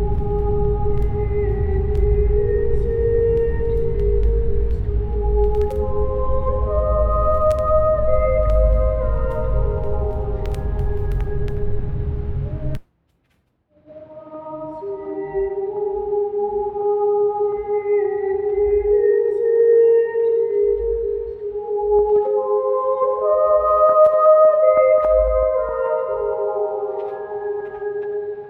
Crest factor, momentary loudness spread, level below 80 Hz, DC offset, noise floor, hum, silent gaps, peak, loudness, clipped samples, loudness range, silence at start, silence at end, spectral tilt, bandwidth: 14 dB; 12 LU; -24 dBFS; under 0.1%; -65 dBFS; none; none; -4 dBFS; -19 LUFS; under 0.1%; 12 LU; 0 s; 0 s; -10 dB/octave; 3.8 kHz